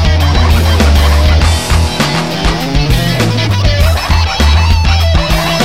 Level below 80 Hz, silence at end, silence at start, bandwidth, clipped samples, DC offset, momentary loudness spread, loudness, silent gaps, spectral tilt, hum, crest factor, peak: -12 dBFS; 0 s; 0 s; 16 kHz; under 0.1%; 3%; 4 LU; -10 LUFS; none; -5 dB/octave; none; 10 dB; 0 dBFS